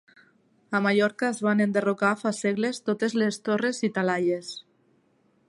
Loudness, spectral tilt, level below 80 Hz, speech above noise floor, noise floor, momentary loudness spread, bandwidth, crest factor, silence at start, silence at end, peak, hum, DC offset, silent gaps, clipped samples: -25 LUFS; -5.5 dB/octave; -74 dBFS; 41 dB; -66 dBFS; 5 LU; 11.5 kHz; 18 dB; 0.7 s; 0.85 s; -8 dBFS; none; under 0.1%; none; under 0.1%